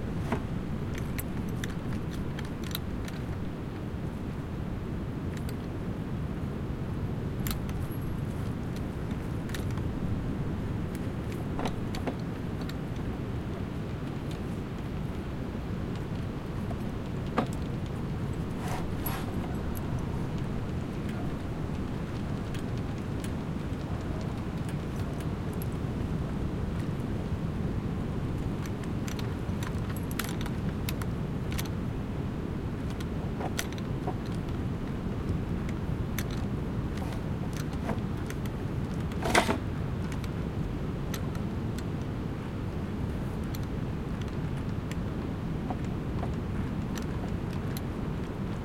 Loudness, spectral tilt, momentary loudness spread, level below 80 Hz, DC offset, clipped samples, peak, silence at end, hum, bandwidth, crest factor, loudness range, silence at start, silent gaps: -34 LUFS; -6.5 dB/octave; 3 LU; -42 dBFS; under 0.1%; under 0.1%; -8 dBFS; 0 s; none; 16.5 kHz; 26 dB; 4 LU; 0 s; none